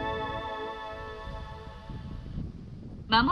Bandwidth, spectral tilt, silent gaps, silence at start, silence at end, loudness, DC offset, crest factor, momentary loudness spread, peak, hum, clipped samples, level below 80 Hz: 11 kHz; -6.5 dB/octave; none; 0 s; 0 s; -35 LUFS; under 0.1%; 24 dB; 15 LU; -8 dBFS; none; under 0.1%; -46 dBFS